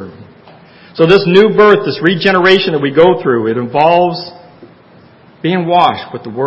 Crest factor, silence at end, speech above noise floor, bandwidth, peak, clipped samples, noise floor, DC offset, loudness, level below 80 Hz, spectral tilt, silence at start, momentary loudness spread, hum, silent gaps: 12 dB; 0 s; 32 dB; 8 kHz; 0 dBFS; 0.5%; -42 dBFS; under 0.1%; -10 LUFS; -50 dBFS; -7 dB/octave; 0 s; 16 LU; none; none